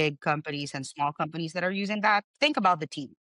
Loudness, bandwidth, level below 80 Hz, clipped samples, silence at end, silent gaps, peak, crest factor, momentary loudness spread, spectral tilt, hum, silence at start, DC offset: -28 LUFS; 11 kHz; -76 dBFS; under 0.1%; 0.3 s; 2.24-2.34 s; -10 dBFS; 18 dB; 10 LU; -4.5 dB/octave; none; 0 s; under 0.1%